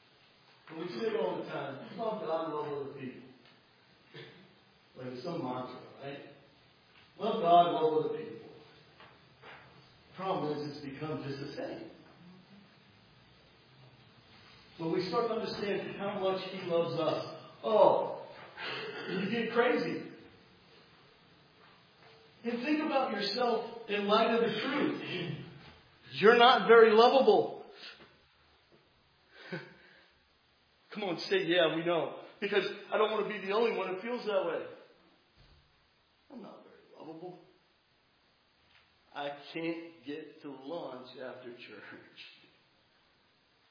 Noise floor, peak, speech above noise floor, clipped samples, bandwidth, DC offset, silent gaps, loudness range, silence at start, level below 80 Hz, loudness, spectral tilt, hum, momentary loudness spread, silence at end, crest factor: -70 dBFS; -10 dBFS; 39 dB; under 0.1%; 5.2 kHz; under 0.1%; none; 19 LU; 0.65 s; -78 dBFS; -31 LUFS; -6 dB/octave; none; 24 LU; 1.4 s; 24 dB